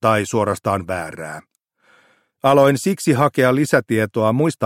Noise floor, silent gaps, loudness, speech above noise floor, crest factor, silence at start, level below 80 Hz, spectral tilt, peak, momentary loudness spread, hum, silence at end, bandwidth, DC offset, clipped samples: -57 dBFS; none; -17 LUFS; 40 dB; 16 dB; 0.05 s; -56 dBFS; -6 dB/octave; -2 dBFS; 14 LU; none; 0 s; 16.5 kHz; under 0.1%; under 0.1%